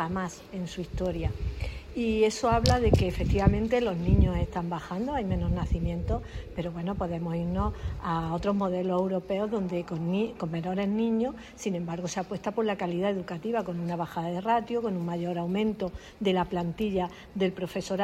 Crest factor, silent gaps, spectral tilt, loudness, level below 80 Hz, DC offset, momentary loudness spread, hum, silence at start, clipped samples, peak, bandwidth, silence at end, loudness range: 24 dB; none; -6.5 dB/octave; -29 LUFS; -38 dBFS; under 0.1%; 10 LU; none; 0 s; under 0.1%; -4 dBFS; 13.5 kHz; 0 s; 5 LU